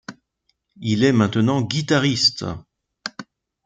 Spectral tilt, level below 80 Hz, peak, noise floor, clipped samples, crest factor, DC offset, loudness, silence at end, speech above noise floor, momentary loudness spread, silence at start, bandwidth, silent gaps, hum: -5 dB/octave; -56 dBFS; -4 dBFS; -71 dBFS; under 0.1%; 18 dB; under 0.1%; -19 LUFS; 0.45 s; 52 dB; 18 LU; 0.1 s; 9.4 kHz; none; none